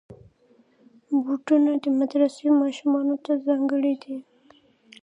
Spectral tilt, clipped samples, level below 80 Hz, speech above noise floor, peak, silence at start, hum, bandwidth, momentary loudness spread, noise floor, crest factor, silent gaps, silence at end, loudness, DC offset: -5.5 dB/octave; under 0.1%; -72 dBFS; 38 dB; -8 dBFS; 0.1 s; none; 9.8 kHz; 6 LU; -60 dBFS; 16 dB; none; 0.8 s; -23 LUFS; under 0.1%